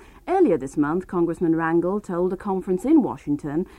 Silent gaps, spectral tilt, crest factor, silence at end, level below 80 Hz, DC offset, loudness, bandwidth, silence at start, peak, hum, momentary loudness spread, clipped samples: none; -8.5 dB/octave; 14 dB; 0.1 s; -50 dBFS; under 0.1%; -22 LUFS; 11.5 kHz; 0.25 s; -8 dBFS; none; 6 LU; under 0.1%